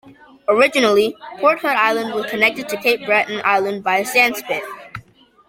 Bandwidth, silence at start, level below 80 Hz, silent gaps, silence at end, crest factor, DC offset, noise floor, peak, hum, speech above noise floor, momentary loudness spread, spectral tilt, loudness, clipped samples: 16.5 kHz; 0.05 s; -62 dBFS; none; 0.5 s; 18 dB; under 0.1%; -46 dBFS; -2 dBFS; none; 29 dB; 11 LU; -3 dB/octave; -17 LUFS; under 0.1%